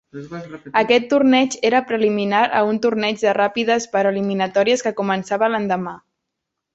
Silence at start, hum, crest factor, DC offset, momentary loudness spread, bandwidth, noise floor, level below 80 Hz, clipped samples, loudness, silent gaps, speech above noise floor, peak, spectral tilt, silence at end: 0.15 s; none; 16 dB; under 0.1%; 8 LU; 8.2 kHz; -80 dBFS; -64 dBFS; under 0.1%; -18 LUFS; none; 62 dB; -2 dBFS; -4.5 dB/octave; 0.75 s